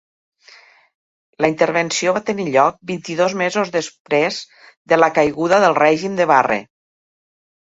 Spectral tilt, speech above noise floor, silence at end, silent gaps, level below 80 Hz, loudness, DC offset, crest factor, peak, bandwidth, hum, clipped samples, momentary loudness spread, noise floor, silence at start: -4 dB/octave; 31 dB; 1.1 s; 4.00-4.05 s, 4.77-4.85 s; -60 dBFS; -17 LUFS; under 0.1%; 18 dB; 0 dBFS; 8 kHz; none; under 0.1%; 8 LU; -48 dBFS; 1.4 s